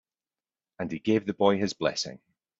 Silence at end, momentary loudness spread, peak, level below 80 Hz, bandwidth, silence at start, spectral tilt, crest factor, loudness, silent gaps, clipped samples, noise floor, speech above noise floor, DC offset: 0.45 s; 11 LU; -8 dBFS; -66 dBFS; 8 kHz; 0.8 s; -5 dB/octave; 22 dB; -28 LUFS; none; under 0.1%; under -90 dBFS; over 63 dB; under 0.1%